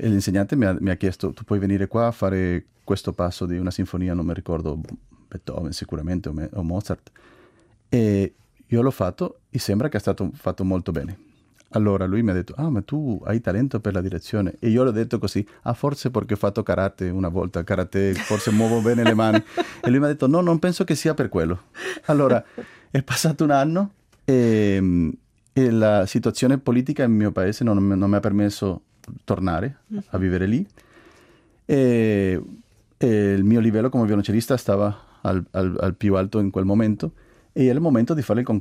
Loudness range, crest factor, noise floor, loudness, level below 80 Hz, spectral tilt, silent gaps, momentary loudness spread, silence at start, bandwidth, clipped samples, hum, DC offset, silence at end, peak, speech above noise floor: 6 LU; 18 dB; -56 dBFS; -22 LUFS; -50 dBFS; -7 dB/octave; none; 11 LU; 0 s; 15.5 kHz; under 0.1%; none; under 0.1%; 0 s; -4 dBFS; 35 dB